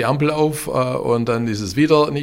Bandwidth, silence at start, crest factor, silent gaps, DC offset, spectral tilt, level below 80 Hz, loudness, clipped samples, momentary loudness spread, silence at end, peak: 16 kHz; 0 s; 16 dB; none; under 0.1%; -6 dB/octave; -48 dBFS; -18 LUFS; under 0.1%; 6 LU; 0 s; -2 dBFS